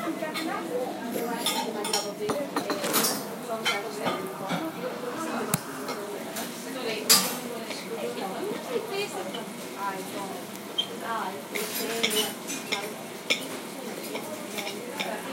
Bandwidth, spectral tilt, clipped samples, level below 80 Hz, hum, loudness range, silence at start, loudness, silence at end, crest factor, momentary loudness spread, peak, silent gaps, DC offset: 16.5 kHz; -2 dB/octave; under 0.1%; -78 dBFS; none; 5 LU; 0 s; -29 LUFS; 0 s; 28 dB; 9 LU; -4 dBFS; none; under 0.1%